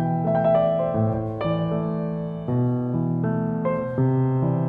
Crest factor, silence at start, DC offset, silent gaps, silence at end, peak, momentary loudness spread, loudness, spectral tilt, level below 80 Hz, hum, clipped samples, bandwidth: 12 dB; 0 s; under 0.1%; none; 0 s; -10 dBFS; 6 LU; -23 LUFS; -11.5 dB/octave; -50 dBFS; none; under 0.1%; 4.5 kHz